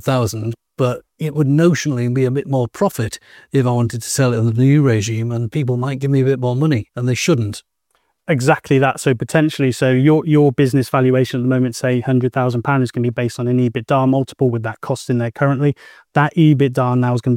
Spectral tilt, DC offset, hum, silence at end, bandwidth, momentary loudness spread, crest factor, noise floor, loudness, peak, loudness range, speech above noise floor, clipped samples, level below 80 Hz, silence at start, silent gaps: -6.5 dB/octave; under 0.1%; none; 0 s; 16 kHz; 8 LU; 16 dB; -66 dBFS; -17 LUFS; 0 dBFS; 3 LU; 50 dB; under 0.1%; -54 dBFS; 0.05 s; none